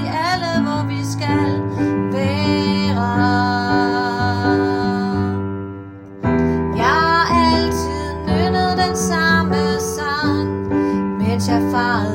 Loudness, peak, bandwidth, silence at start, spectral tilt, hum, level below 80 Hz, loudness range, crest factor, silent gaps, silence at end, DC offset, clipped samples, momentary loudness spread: -18 LUFS; -2 dBFS; 16.5 kHz; 0 s; -5.5 dB/octave; none; -42 dBFS; 2 LU; 16 dB; none; 0 s; under 0.1%; under 0.1%; 7 LU